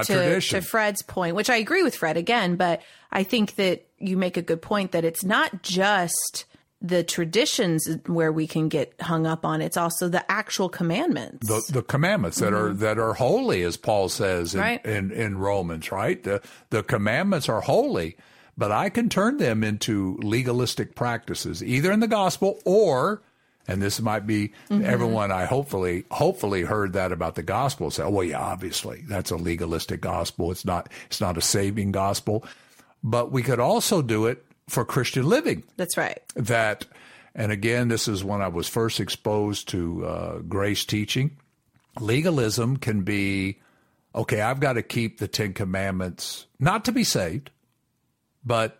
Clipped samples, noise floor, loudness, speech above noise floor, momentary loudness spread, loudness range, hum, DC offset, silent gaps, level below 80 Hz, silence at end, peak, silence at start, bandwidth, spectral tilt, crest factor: under 0.1%; -73 dBFS; -25 LUFS; 48 dB; 8 LU; 3 LU; none; under 0.1%; none; -52 dBFS; 0.1 s; -6 dBFS; 0 s; 16.5 kHz; -4.5 dB/octave; 18 dB